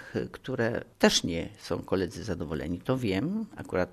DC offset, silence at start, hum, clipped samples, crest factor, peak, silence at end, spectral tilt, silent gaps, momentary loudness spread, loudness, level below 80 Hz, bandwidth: under 0.1%; 0 s; none; under 0.1%; 24 dB; -6 dBFS; 0 s; -4.5 dB/octave; none; 11 LU; -30 LUFS; -54 dBFS; 13.5 kHz